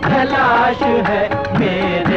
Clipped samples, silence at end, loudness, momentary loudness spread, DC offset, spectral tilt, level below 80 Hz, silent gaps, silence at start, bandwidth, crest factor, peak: under 0.1%; 0 s; -15 LUFS; 4 LU; under 0.1%; -7 dB/octave; -40 dBFS; none; 0 s; 8.4 kHz; 12 dB; -4 dBFS